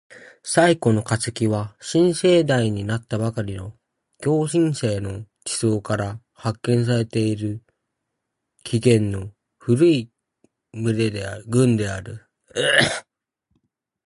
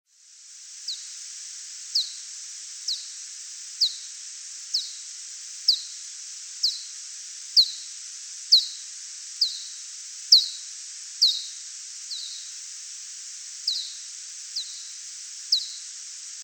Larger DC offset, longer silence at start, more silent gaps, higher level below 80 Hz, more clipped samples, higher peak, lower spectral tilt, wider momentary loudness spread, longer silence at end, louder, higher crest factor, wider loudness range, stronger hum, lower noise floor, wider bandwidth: neither; second, 0.1 s vs 0.25 s; neither; first, -50 dBFS vs under -90 dBFS; neither; first, 0 dBFS vs -4 dBFS; first, -5.5 dB/octave vs 9.5 dB/octave; about the same, 15 LU vs 17 LU; first, 1.05 s vs 0 s; first, -21 LUFS vs -26 LUFS; about the same, 22 dB vs 26 dB; second, 4 LU vs 9 LU; neither; first, -79 dBFS vs -50 dBFS; second, 11.5 kHz vs 18 kHz